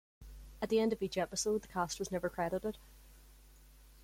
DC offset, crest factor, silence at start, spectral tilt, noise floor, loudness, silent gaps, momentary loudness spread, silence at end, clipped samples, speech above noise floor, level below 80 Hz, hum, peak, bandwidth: under 0.1%; 18 dB; 0.2 s; -4 dB/octave; -59 dBFS; -36 LUFS; none; 21 LU; 0 s; under 0.1%; 24 dB; -58 dBFS; none; -20 dBFS; 16.5 kHz